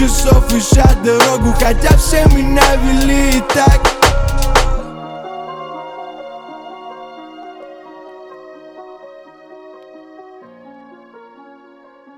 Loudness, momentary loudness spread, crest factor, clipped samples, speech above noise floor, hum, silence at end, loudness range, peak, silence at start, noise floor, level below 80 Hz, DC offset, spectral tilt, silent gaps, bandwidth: -12 LUFS; 25 LU; 14 dB; under 0.1%; 34 dB; none; 3.2 s; 23 LU; 0 dBFS; 0 s; -43 dBFS; -18 dBFS; under 0.1%; -4.5 dB/octave; none; 18 kHz